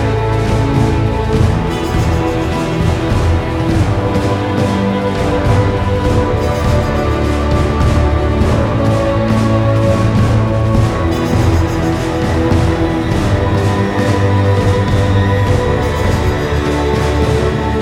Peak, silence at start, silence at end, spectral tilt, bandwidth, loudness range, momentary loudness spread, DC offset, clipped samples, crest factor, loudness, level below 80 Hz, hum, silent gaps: 0 dBFS; 0 s; 0 s; -7 dB/octave; 13.5 kHz; 2 LU; 3 LU; under 0.1%; under 0.1%; 12 dB; -14 LUFS; -22 dBFS; none; none